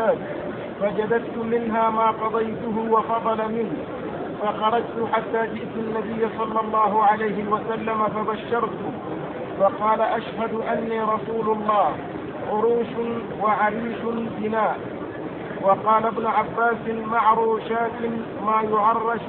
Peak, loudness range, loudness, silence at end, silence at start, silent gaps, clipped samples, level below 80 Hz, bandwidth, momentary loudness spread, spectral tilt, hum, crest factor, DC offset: -6 dBFS; 2 LU; -23 LUFS; 0 s; 0 s; none; under 0.1%; -56 dBFS; 4.3 kHz; 10 LU; -10 dB/octave; none; 16 dB; under 0.1%